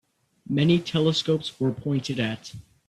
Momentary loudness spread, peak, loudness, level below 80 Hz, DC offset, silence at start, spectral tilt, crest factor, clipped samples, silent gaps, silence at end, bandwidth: 8 LU; -8 dBFS; -25 LUFS; -60 dBFS; under 0.1%; 0.5 s; -6 dB/octave; 18 dB; under 0.1%; none; 0.25 s; 12 kHz